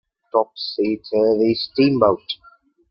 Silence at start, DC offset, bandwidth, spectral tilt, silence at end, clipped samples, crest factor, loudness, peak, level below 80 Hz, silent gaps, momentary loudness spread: 0.35 s; under 0.1%; 5.8 kHz; -9 dB/octave; 0.55 s; under 0.1%; 18 dB; -19 LUFS; -2 dBFS; -58 dBFS; none; 10 LU